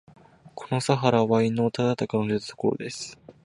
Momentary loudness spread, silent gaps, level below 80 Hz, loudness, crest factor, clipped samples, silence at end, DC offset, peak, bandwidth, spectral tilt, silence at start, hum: 15 LU; none; -62 dBFS; -25 LUFS; 20 dB; under 0.1%; 0.15 s; under 0.1%; -4 dBFS; 11.5 kHz; -6 dB/octave; 0.45 s; none